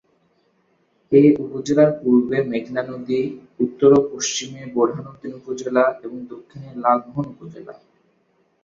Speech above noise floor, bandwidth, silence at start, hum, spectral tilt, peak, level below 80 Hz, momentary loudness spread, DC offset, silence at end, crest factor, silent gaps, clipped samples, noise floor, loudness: 44 dB; 7.8 kHz; 1.1 s; none; -5.5 dB/octave; -2 dBFS; -62 dBFS; 20 LU; under 0.1%; 0.9 s; 18 dB; none; under 0.1%; -64 dBFS; -19 LUFS